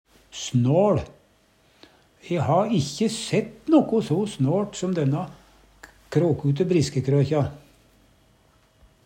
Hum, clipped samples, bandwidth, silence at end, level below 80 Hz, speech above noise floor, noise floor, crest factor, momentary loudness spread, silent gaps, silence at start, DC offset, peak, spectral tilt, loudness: none; under 0.1%; 10.5 kHz; 1.5 s; -56 dBFS; 38 dB; -60 dBFS; 20 dB; 10 LU; none; 0.35 s; under 0.1%; -4 dBFS; -6.5 dB/octave; -23 LUFS